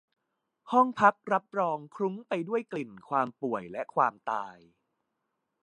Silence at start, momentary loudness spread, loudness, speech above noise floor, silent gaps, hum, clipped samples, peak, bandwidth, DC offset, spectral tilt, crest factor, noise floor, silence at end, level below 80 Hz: 0.65 s; 11 LU; -29 LUFS; 53 dB; none; none; under 0.1%; -8 dBFS; 10.5 kHz; under 0.1%; -6.5 dB/octave; 24 dB; -82 dBFS; 1.1 s; -76 dBFS